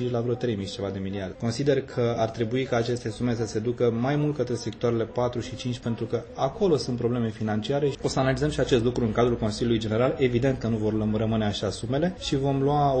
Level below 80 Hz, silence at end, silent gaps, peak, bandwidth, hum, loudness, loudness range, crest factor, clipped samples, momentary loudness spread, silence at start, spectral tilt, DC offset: -46 dBFS; 0 s; none; -8 dBFS; 8.8 kHz; none; -26 LUFS; 3 LU; 16 dB; under 0.1%; 7 LU; 0 s; -6.5 dB/octave; under 0.1%